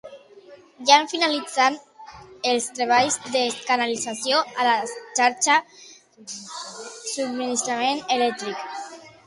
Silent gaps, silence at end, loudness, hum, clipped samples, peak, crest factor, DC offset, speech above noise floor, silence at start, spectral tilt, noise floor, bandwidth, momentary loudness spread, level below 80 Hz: none; 0.15 s; -22 LUFS; none; under 0.1%; -2 dBFS; 22 dB; under 0.1%; 25 dB; 0.05 s; -1 dB/octave; -48 dBFS; 11.5 kHz; 17 LU; -70 dBFS